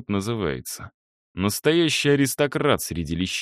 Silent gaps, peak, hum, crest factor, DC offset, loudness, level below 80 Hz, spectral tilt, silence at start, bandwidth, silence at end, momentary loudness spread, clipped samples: 0.94-1.35 s; -6 dBFS; none; 18 dB; under 0.1%; -22 LUFS; -48 dBFS; -4.5 dB/octave; 0 s; 15.5 kHz; 0 s; 13 LU; under 0.1%